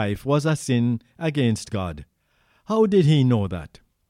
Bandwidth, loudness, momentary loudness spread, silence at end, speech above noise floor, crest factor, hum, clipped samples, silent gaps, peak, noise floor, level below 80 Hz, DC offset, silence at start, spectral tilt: 14 kHz; -22 LUFS; 12 LU; 0.4 s; 43 dB; 14 dB; none; under 0.1%; none; -8 dBFS; -64 dBFS; -50 dBFS; under 0.1%; 0 s; -7 dB/octave